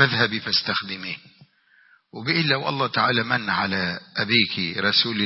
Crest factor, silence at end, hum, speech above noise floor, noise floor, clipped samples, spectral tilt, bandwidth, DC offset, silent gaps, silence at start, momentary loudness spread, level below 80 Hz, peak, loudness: 20 dB; 0 s; none; 35 dB; -58 dBFS; under 0.1%; -7 dB/octave; 6 kHz; under 0.1%; none; 0 s; 12 LU; -62 dBFS; -4 dBFS; -22 LUFS